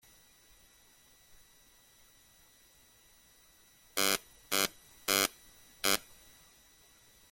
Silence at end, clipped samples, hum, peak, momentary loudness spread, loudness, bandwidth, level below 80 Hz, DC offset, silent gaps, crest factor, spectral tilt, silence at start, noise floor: 1.3 s; under 0.1%; none; -8 dBFS; 10 LU; -32 LUFS; 17 kHz; -68 dBFS; under 0.1%; none; 32 dB; -0.5 dB/octave; 3.95 s; -63 dBFS